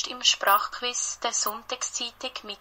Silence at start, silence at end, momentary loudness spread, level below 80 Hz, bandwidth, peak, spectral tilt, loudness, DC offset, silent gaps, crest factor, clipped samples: 0 s; 0.05 s; 10 LU; -64 dBFS; 16.5 kHz; -6 dBFS; 2 dB/octave; -26 LUFS; under 0.1%; none; 22 dB; under 0.1%